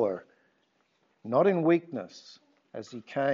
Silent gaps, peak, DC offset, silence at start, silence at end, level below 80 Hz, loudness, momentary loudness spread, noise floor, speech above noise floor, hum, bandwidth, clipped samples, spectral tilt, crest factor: none; -12 dBFS; under 0.1%; 0 s; 0 s; -84 dBFS; -28 LUFS; 22 LU; -72 dBFS; 44 dB; none; 7.4 kHz; under 0.1%; -6 dB/octave; 18 dB